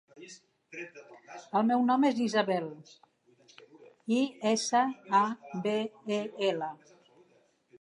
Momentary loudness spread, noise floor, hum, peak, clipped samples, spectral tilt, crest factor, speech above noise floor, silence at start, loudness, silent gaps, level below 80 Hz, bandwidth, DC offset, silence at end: 21 LU; -67 dBFS; none; -12 dBFS; under 0.1%; -4.5 dB/octave; 18 dB; 37 dB; 0.15 s; -30 LUFS; none; -86 dBFS; 11 kHz; under 0.1%; 1.05 s